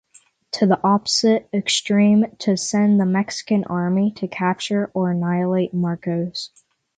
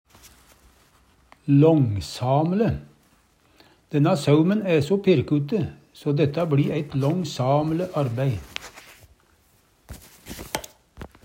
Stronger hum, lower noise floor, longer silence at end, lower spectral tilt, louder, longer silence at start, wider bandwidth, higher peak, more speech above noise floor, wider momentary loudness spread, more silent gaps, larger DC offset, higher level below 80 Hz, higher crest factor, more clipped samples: neither; second, -55 dBFS vs -61 dBFS; first, 0.5 s vs 0.2 s; second, -5 dB/octave vs -7.5 dB/octave; about the same, -20 LUFS vs -22 LUFS; second, 0.55 s vs 1.45 s; second, 9.4 kHz vs 16 kHz; about the same, -4 dBFS vs -6 dBFS; second, 36 dB vs 40 dB; second, 7 LU vs 18 LU; neither; neither; second, -64 dBFS vs -52 dBFS; about the same, 16 dB vs 18 dB; neither